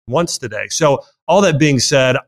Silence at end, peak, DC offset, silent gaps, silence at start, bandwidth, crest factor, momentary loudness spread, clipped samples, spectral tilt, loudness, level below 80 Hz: 0.05 s; -2 dBFS; under 0.1%; 1.22-1.27 s; 0.05 s; 16 kHz; 12 dB; 9 LU; under 0.1%; -4 dB/octave; -15 LUFS; -46 dBFS